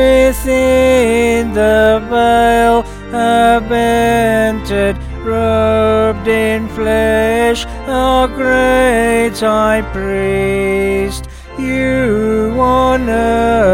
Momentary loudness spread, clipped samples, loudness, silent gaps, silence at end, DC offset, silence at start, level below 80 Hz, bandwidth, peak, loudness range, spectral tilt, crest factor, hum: 7 LU; under 0.1%; -12 LUFS; none; 0 s; under 0.1%; 0 s; -26 dBFS; 17 kHz; 0 dBFS; 3 LU; -5.5 dB/octave; 12 dB; none